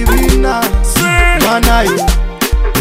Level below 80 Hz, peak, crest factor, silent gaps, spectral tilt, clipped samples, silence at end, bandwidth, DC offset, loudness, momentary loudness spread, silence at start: -12 dBFS; 0 dBFS; 10 dB; none; -4 dB/octave; 0.3%; 0 s; 16.5 kHz; 0.5%; -11 LUFS; 5 LU; 0 s